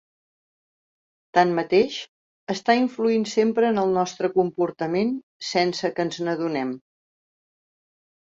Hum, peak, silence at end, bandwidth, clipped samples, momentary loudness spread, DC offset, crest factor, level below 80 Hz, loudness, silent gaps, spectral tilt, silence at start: none; -4 dBFS; 1.5 s; 7.8 kHz; under 0.1%; 11 LU; under 0.1%; 20 dB; -68 dBFS; -23 LUFS; 2.08-2.47 s, 5.23-5.40 s; -5 dB/octave; 1.35 s